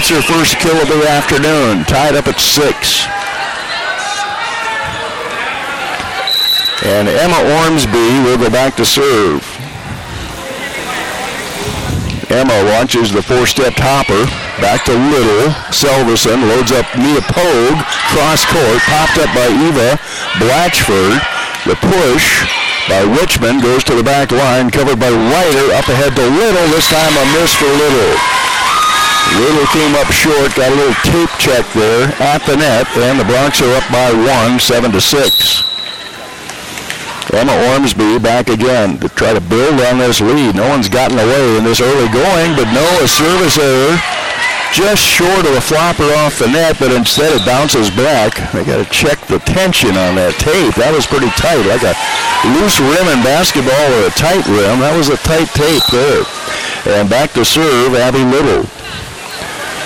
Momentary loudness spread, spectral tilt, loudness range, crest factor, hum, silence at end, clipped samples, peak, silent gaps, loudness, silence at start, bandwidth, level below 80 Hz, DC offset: 8 LU; -3.5 dB/octave; 3 LU; 10 dB; none; 0 s; under 0.1%; 0 dBFS; none; -10 LUFS; 0 s; 17 kHz; -32 dBFS; under 0.1%